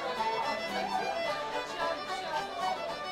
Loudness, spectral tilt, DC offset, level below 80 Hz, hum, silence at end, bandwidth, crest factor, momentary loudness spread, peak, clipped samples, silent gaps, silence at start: -33 LUFS; -3 dB/octave; under 0.1%; -64 dBFS; none; 0 s; 16 kHz; 14 dB; 3 LU; -20 dBFS; under 0.1%; none; 0 s